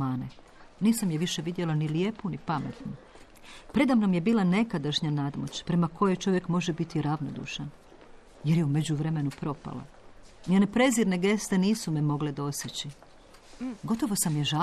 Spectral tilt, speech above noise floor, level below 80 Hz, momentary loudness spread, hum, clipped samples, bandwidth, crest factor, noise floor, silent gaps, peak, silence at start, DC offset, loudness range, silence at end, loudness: -5.5 dB/octave; 25 dB; -56 dBFS; 14 LU; none; under 0.1%; 13 kHz; 16 dB; -52 dBFS; none; -12 dBFS; 0 s; under 0.1%; 4 LU; 0 s; -28 LUFS